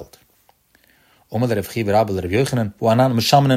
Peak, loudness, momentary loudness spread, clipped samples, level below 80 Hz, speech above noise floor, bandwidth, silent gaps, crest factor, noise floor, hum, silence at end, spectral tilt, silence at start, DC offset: -2 dBFS; -19 LUFS; 7 LU; under 0.1%; -52 dBFS; 41 dB; 16 kHz; none; 18 dB; -58 dBFS; none; 0 s; -6 dB/octave; 0 s; under 0.1%